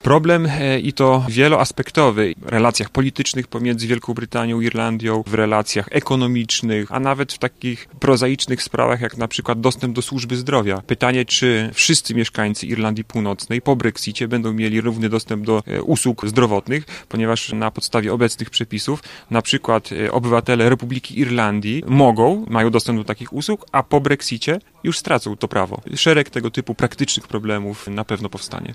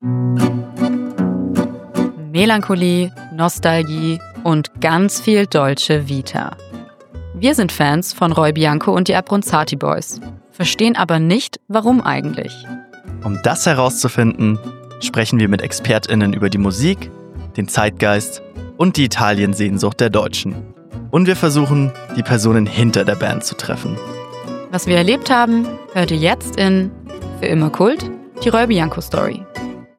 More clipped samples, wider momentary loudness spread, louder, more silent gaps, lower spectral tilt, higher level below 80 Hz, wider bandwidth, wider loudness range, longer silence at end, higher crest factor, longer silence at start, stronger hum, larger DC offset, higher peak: neither; second, 8 LU vs 14 LU; second, -19 LUFS vs -16 LUFS; neither; about the same, -4.5 dB/octave vs -5.5 dB/octave; second, -50 dBFS vs -44 dBFS; about the same, 15 kHz vs 16.5 kHz; about the same, 3 LU vs 2 LU; second, 0 s vs 0.15 s; about the same, 16 dB vs 16 dB; about the same, 0.05 s vs 0 s; neither; neither; about the same, -2 dBFS vs 0 dBFS